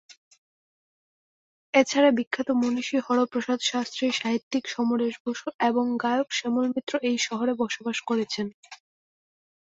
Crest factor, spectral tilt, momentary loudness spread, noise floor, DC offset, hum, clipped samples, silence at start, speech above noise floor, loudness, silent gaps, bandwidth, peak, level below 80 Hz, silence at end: 22 dB; -3.5 dB/octave; 7 LU; under -90 dBFS; under 0.1%; none; under 0.1%; 1.75 s; over 65 dB; -26 LUFS; 2.27-2.31 s, 4.43-4.51 s, 5.20-5.25 s, 5.54-5.59 s, 6.83-6.87 s, 8.54-8.63 s; 8 kHz; -4 dBFS; -74 dBFS; 1 s